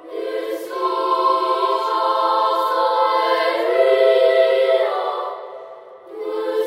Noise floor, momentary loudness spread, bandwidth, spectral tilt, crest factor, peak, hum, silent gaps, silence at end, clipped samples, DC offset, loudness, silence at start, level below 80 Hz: -39 dBFS; 15 LU; 16 kHz; -2 dB/octave; 14 dB; -4 dBFS; none; none; 0 s; under 0.1%; under 0.1%; -18 LUFS; 0 s; -82 dBFS